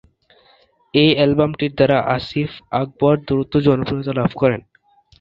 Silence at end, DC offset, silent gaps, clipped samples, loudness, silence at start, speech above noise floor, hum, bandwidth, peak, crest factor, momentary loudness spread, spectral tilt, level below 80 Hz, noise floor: 0.6 s; under 0.1%; none; under 0.1%; -18 LUFS; 0.95 s; 38 dB; none; 5.8 kHz; -2 dBFS; 18 dB; 9 LU; -9 dB/octave; -46 dBFS; -55 dBFS